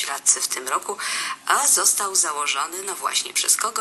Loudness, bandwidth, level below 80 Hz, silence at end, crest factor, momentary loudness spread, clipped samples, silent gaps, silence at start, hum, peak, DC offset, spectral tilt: -20 LUFS; 13 kHz; -76 dBFS; 0 s; 22 dB; 9 LU; under 0.1%; none; 0 s; none; -2 dBFS; under 0.1%; 2.5 dB/octave